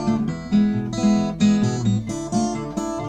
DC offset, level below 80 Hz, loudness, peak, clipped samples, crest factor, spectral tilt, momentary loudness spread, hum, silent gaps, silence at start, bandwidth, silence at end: under 0.1%; -44 dBFS; -21 LUFS; -8 dBFS; under 0.1%; 14 dB; -6.5 dB/octave; 6 LU; none; none; 0 s; 9.8 kHz; 0 s